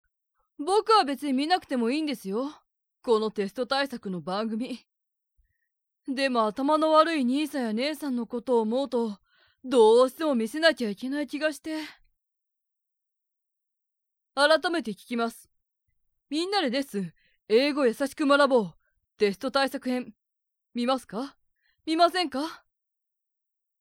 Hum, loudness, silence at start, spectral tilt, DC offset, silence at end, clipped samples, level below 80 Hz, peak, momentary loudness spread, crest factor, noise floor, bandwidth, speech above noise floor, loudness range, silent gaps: none; -26 LUFS; 0.6 s; -4.5 dB/octave; under 0.1%; 1.25 s; under 0.1%; -72 dBFS; -6 dBFS; 15 LU; 20 dB; -84 dBFS; 16.5 kHz; 59 dB; 6 LU; none